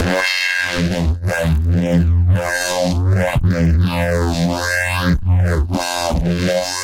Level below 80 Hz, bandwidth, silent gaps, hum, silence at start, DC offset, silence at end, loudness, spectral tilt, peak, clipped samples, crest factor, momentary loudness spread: -24 dBFS; 16.5 kHz; none; none; 0 s; under 0.1%; 0 s; -17 LUFS; -5.5 dB/octave; -6 dBFS; under 0.1%; 10 dB; 3 LU